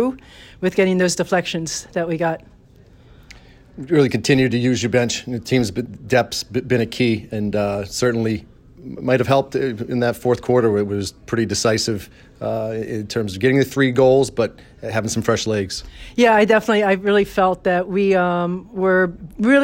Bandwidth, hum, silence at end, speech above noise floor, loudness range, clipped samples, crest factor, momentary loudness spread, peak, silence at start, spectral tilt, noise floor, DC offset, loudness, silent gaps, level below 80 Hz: 16.5 kHz; none; 0 s; 29 dB; 4 LU; under 0.1%; 16 dB; 9 LU; -4 dBFS; 0 s; -5 dB/octave; -48 dBFS; under 0.1%; -19 LUFS; none; -48 dBFS